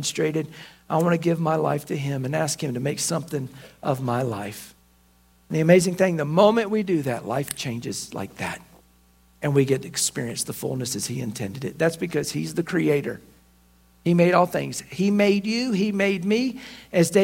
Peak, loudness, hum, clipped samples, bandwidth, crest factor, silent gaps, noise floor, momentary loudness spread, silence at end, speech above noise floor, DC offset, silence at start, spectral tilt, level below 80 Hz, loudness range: -2 dBFS; -24 LUFS; none; under 0.1%; 16.5 kHz; 22 dB; none; -58 dBFS; 13 LU; 0 s; 35 dB; under 0.1%; 0 s; -5 dB/octave; -60 dBFS; 5 LU